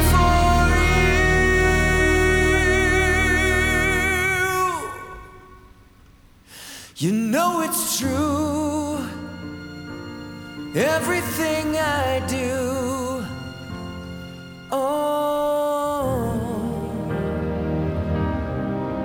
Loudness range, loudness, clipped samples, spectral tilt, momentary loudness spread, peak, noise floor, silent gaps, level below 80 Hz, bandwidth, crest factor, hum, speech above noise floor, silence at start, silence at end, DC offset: 8 LU; -21 LUFS; under 0.1%; -5 dB/octave; 18 LU; -4 dBFS; -50 dBFS; none; -30 dBFS; over 20 kHz; 16 dB; none; 29 dB; 0 s; 0 s; under 0.1%